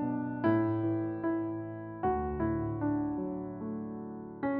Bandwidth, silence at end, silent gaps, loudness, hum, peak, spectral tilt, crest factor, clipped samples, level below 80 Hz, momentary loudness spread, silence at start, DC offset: 3.9 kHz; 0 s; none; -34 LUFS; none; -18 dBFS; -9 dB/octave; 16 dB; under 0.1%; -52 dBFS; 10 LU; 0 s; under 0.1%